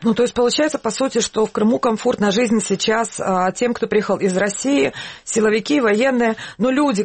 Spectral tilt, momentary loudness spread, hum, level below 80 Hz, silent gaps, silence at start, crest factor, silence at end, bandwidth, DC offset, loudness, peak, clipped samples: -4 dB/octave; 4 LU; none; -54 dBFS; none; 0 s; 12 dB; 0 s; 8.8 kHz; under 0.1%; -18 LUFS; -6 dBFS; under 0.1%